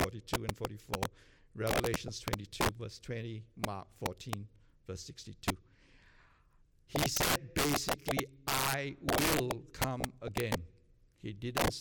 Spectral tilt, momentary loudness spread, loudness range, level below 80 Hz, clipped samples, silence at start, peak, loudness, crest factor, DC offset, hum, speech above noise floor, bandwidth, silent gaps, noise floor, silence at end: -3.5 dB/octave; 15 LU; 10 LU; -52 dBFS; under 0.1%; 0 s; -20 dBFS; -36 LUFS; 18 dB; under 0.1%; none; 30 dB; 17.5 kHz; none; -66 dBFS; 0 s